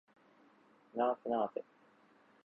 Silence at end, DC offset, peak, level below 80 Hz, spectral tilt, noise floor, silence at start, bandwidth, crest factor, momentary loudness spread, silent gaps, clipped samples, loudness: 0.85 s; under 0.1%; -22 dBFS; -84 dBFS; -4 dB/octave; -67 dBFS; 0.95 s; 4.8 kHz; 20 dB; 12 LU; none; under 0.1%; -37 LUFS